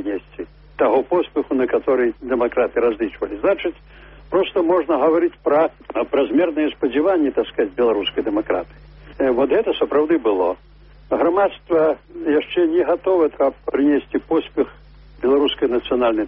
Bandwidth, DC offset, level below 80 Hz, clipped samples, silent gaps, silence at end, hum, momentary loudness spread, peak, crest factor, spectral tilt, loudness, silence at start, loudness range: 5.2 kHz; under 0.1%; -48 dBFS; under 0.1%; none; 0 s; none; 7 LU; -6 dBFS; 14 dB; -3 dB/octave; -19 LUFS; 0 s; 2 LU